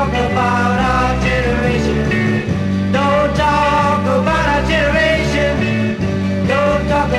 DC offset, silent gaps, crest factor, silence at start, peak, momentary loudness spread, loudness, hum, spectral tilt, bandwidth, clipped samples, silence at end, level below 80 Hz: under 0.1%; none; 12 dB; 0 s; -2 dBFS; 4 LU; -15 LUFS; none; -6 dB/octave; 12.5 kHz; under 0.1%; 0 s; -26 dBFS